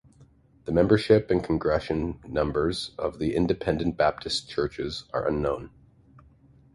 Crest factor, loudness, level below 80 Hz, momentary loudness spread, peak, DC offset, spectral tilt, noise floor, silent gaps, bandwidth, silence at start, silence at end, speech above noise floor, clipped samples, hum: 20 dB; -26 LUFS; -44 dBFS; 9 LU; -6 dBFS; under 0.1%; -6.5 dB/octave; -57 dBFS; none; 11.5 kHz; 0.2 s; 1.05 s; 31 dB; under 0.1%; none